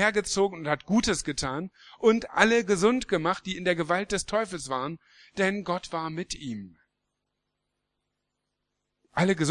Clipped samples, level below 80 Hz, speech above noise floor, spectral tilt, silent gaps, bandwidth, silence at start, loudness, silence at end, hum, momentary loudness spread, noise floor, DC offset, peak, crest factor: under 0.1%; -54 dBFS; 55 dB; -4 dB/octave; none; 12 kHz; 0 s; -27 LUFS; 0 s; 50 Hz at -55 dBFS; 13 LU; -82 dBFS; under 0.1%; -2 dBFS; 26 dB